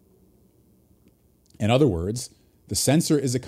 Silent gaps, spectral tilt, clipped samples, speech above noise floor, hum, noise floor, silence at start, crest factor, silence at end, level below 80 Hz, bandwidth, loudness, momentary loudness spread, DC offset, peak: none; -5 dB/octave; under 0.1%; 38 dB; none; -60 dBFS; 1.6 s; 20 dB; 0 s; -50 dBFS; 15.5 kHz; -23 LUFS; 11 LU; under 0.1%; -6 dBFS